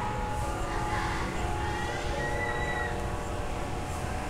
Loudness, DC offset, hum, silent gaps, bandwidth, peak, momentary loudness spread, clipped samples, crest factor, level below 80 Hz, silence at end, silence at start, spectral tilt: -32 LUFS; under 0.1%; none; none; 16 kHz; -18 dBFS; 4 LU; under 0.1%; 14 dB; -38 dBFS; 0 s; 0 s; -5 dB/octave